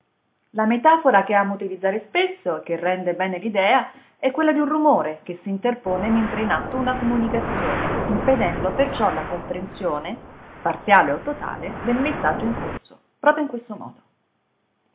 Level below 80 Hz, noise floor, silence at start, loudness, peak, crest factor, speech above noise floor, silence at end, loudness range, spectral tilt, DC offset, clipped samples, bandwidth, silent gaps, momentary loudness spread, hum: -44 dBFS; -70 dBFS; 0.55 s; -21 LUFS; 0 dBFS; 22 dB; 48 dB; 1.05 s; 3 LU; -9.5 dB/octave; under 0.1%; under 0.1%; 4 kHz; none; 13 LU; none